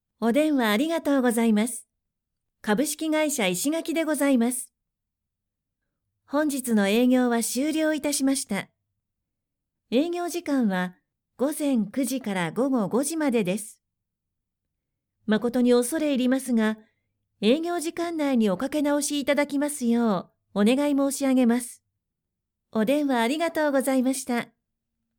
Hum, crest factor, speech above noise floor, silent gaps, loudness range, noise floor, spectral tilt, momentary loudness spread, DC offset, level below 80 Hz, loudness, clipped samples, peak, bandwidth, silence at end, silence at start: none; 16 dB; 61 dB; none; 3 LU; -84 dBFS; -4.5 dB/octave; 8 LU; under 0.1%; -70 dBFS; -24 LUFS; under 0.1%; -10 dBFS; 19.5 kHz; 0.75 s; 0.2 s